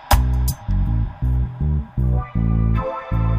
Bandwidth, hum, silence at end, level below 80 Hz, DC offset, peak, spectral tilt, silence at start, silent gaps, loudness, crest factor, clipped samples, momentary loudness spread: 15.5 kHz; none; 0 s; -22 dBFS; under 0.1%; -2 dBFS; -6.5 dB/octave; 0 s; none; -21 LUFS; 18 dB; under 0.1%; 4 LU